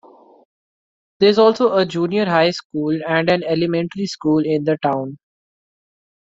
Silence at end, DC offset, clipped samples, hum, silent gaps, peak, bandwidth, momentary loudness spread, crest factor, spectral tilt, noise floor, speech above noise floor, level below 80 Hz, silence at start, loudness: 1.05 s; under 0.1%; under 0.1%; none; 2.65-2.70 s; -2 dBFS; 7.8 kHz; 9 LU; 18 dB; -6 dB/octave; under -90 dBFS; over 73 dB; -62 dBFS; 1.2 s; -18 LUFS